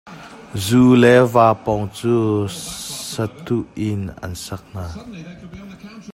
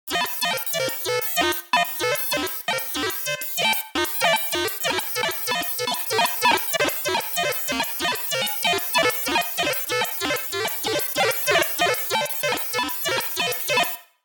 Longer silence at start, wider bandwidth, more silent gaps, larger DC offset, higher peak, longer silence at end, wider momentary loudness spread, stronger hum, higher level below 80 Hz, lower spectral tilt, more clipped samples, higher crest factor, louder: about the same, 0.05 s vs 0.05 s; second, 16.5 kHz vs 19.5 kHz; neither; neither; first, 0 dBFS vs -6 dBFS; second, 0 s vs 0.2 s; first, 25 LU vs 4 LU; neither; first, -48 dBFS vs -62 dBFS; first, -6 dB/octave vs -1.5 dB/octave; neither; about the same, 18 dB vs 18 dB; first, -17 LUFS vs -22 LUFS